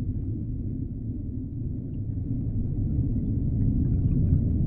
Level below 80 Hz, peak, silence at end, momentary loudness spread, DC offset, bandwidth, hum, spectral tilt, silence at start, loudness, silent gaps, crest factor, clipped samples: -32 dBFS; -10 dBFS; 0 s; 9 LU; under 0.1%; 1.5 kHz; none; -15 dB/octave; 0 s; -29 LUFS; none; 16 dB; under 0.1%